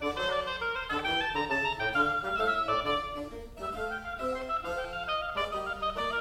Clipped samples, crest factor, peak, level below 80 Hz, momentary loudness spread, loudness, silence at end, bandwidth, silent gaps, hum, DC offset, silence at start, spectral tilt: under 0.1%; 18 dB; -14 dBFS; -50 dBFS; 8 LU; -31 LUFS; 0 s; 16 kHz; none; none; under 0.1%; 0 s; -4 dB/octave